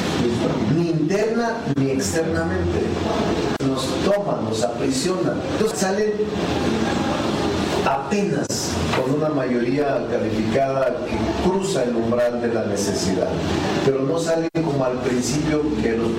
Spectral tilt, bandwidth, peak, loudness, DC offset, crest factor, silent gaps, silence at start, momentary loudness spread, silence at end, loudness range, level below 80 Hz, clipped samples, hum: -5.5 dB/octave; 16 kHz; -6 dBFS; -21 LUFS; under 0.1%; 16 dB; none; 0 s; 2 LU; 0 s; 1 LU; -42 dBFS; under 0.1%; none